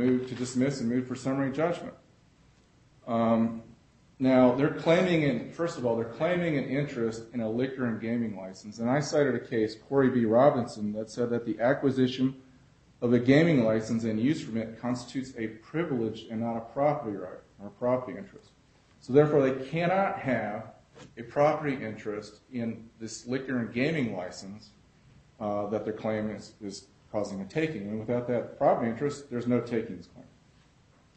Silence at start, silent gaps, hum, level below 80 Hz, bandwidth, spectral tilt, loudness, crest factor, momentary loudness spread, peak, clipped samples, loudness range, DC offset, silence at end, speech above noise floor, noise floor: 0 s; none; none; -64 dBFS; 8.4 kHz; -7 dB/octave; -29 LUFS; 20 dB; 17 LU; -8 dBFS; under 0.1%; 7 LU; under 0.1%; 0.95 s; 33 dB; -61 dBFS